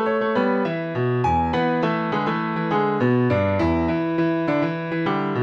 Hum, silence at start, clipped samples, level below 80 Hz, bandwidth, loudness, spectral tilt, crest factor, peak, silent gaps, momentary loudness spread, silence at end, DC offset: none; 0 s; under 0.1%; -48 dBFS; 7.4 kHz; -22 LUFS; -8.5 dB/octave; 12 dB; -8 dBFS; none; 4 LU; 0 s; under 0.1%